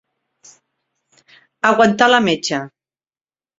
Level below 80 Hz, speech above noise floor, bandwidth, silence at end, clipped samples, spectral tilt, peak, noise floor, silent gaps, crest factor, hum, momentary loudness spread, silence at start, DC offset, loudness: -60 dBFS; over 76 dB; 7.8 kHz; 0.9 s; under 0.1%; -4 dB/octave; 0 dBFS; under -90 dBFS; none; 20 dB; none; 12 LU; 1.65 s; under 0.1%; -15 LUFS